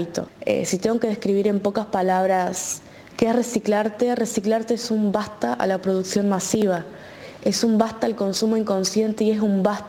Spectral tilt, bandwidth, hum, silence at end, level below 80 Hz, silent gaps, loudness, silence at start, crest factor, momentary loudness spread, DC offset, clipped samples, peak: -5 dB/octave; 17 kHz; none; 0 s; -60 dBFS; none; -22 LUFS; 0 s; 20 dB; 7 LU; under 0.1%; under 0.1%; -2 dBFS